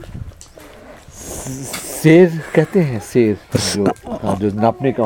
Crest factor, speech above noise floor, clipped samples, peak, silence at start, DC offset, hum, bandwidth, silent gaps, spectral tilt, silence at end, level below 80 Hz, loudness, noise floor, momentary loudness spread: 16 dB; 24 dB; under 0.1%; 0 dBFS; 0 s; under 0.1%; none; 18 kHz; none; -6 dB/octave; 0 s; -42 dBFS; -16 LUFS; -39 dBFS; 19 LU